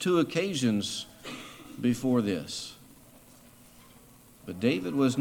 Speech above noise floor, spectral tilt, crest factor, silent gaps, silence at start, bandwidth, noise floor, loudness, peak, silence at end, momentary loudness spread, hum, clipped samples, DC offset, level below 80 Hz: 27 dB; -5 dB/octave; 18 dB; none; 0 s; 18.5 kHz; -55 dBFS; -29 LUFS; -12 dBFS; 0 s; 17 LU; none; under 0.1%; under 0.1%; -64 dBFS